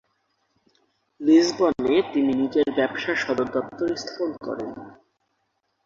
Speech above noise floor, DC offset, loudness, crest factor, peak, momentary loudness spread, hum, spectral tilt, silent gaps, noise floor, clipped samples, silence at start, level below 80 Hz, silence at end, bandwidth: 51 dB; under 0.1%; -23 LUFS; 18 dB; -6 dBFS; 14 LU; none; -4.5 dB/octave; none; -73 dBFS; under 0.1%; 1.2 s; -60 dBFS; 0.95 s; 7.6 kHz